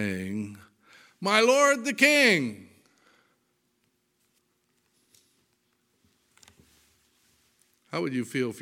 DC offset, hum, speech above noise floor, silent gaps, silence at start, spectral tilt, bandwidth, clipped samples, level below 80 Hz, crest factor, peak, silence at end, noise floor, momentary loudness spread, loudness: under 0.1%; none; 49 dB; none; 0 s; -3.5 dB/octave; 17 kHz; under 0.1%; -78 dBFS; 24 dB; -4 dBFS; 0 s; -73 dBFS; 17 LU; -24 LUFS